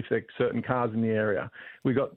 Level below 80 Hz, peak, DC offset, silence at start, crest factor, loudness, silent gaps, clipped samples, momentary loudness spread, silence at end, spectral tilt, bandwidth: -64 dBFS; -12 dBFS; under 0.1%; 0 s; 18 dB; -28 LUFS; none; under 0.1%; 6 LU; 0.05 s; -10 dB/octave; 4.1 kHz